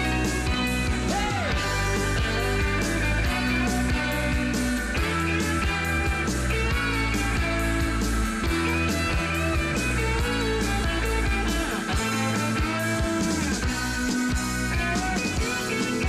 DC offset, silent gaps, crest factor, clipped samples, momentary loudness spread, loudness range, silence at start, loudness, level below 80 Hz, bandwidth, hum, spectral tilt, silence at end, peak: under 0.1%; none; 10 dB; under 0.1%; 2 LU; 1 LU; 0 s; -25 LUFS; -30 dBFS; 15.5 kHz; none; -4.5 dB/octave; 0 s; -14 dBFS